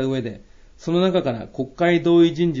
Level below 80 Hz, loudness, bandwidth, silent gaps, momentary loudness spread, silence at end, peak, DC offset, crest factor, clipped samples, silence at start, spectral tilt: -50 dBFS; -19 LUFS; 7.6 kHz; none; 14 LU; 0 s; -6 dBFS; under 0.1%; 14 dB; under 0.1%; 0 s; -7.5 dB/octave